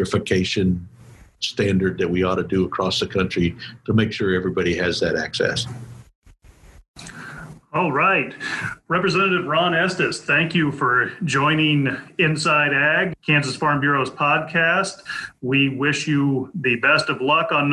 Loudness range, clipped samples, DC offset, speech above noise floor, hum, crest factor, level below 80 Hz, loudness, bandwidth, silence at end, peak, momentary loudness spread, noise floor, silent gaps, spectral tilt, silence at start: 6 LU; under 0.1%; under 0.1%; 28 dB; none; 16 dB; -46 dBFS; -20 LUFS; 12 kHz; 0 s; -6 dBFS; 10 LU; -48 dBFS; 6.15-6.22 s, 6.88-6.94 s; -5 dB/octave; 0 s